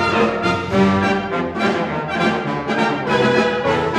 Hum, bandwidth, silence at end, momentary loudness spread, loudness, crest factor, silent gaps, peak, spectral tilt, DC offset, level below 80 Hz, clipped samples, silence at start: none; 11 kHz; 0 s; 5 LU; -18 LUFS; 14 dB; none; -4 dBFS; -6 dB/octave; under 0.1%; -46 dBFS; under 0.1%; 0 s